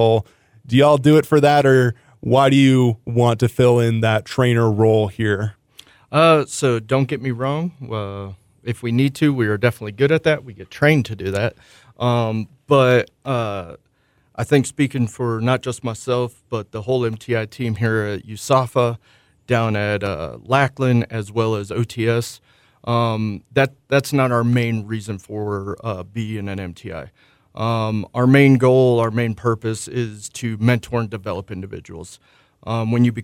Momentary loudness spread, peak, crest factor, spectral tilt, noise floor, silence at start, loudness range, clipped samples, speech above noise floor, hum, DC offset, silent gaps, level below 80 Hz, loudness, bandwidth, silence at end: 15 LU; -2 dBFS; 16 dB; -6.5 dB/octave; -61 dBFS; 0 s; 6 LU; under 0.1%; 43 dB; none; under 0.1%; none; -54 dBFS; -19 LUFS; 16 kHz; 0 s